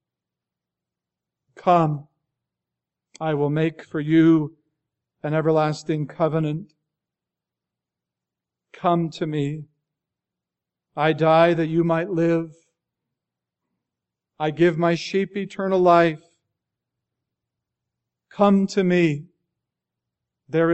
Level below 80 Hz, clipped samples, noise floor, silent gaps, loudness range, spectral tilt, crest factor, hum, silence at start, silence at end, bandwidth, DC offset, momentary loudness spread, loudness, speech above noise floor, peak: -66 dBFS; under 0.1%; -87 dBFS; none; 7 LU; -7.5 dB/octave; 20 dB; none; 1.6 s; 0 s; 8.2 kHz; under 0.1%; 13 LU; -21 LUFS; 67 dB; -2 dBFS